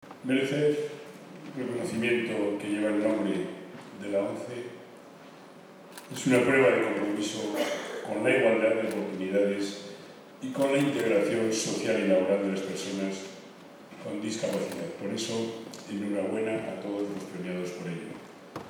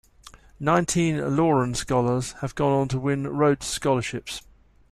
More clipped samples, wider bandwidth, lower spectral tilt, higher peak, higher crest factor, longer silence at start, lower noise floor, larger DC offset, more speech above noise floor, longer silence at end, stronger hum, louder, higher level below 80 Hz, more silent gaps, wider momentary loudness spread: neither; first, 19.5 kHz vs 14 kHz; about the same, -5 dB/octave vs -5.5 dB/octave; about the same, -10 dBFS vs -8 dBFS; about the same, 18 dB vs 18 dB; second, 0.05 s vs 0.35 s; about the same, -49 dBFS vs -50 dBFS; neither; second, 21 dB vs 27 dB; second, 0 s vs 0.5 s; neither; second, -29 LUFS vs -24 LUFS; second, -78 dBFS vs -48 dBFS; neither; first, 20 LU vs 9 LU